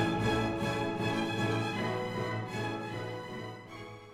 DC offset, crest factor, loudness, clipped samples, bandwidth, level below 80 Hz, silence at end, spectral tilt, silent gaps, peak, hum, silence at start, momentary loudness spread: under 0.1%; 16 dB; -34 LUFS; under 0.1%; 15.5 kHz; -56 dBFS; 0 s; -6 dB/octave; none; -18 dBFS; none; 0 s; 12 LU